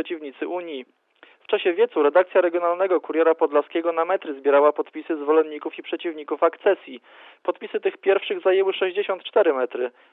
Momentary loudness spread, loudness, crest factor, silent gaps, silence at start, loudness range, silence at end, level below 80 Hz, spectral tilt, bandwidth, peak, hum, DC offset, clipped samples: 12 LU; -22 LUFS; 18 dB; none; 0 s; 4 LU; 0.25 s; under -90 dBFS; -7 dB/octave; 4 kHz; -4 dBFS; none; under 0.1%; under 0.1%